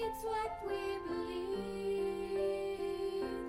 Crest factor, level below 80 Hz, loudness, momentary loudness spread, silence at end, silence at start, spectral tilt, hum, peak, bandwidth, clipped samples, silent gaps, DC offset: 12 dB; -58 dBFS; -38 LUFS; 3 LU; 0 s; 0 s; -5.5 dB/octave; none; -26 dBFS; 16 kHz; under 0.1%; none; under 0.1%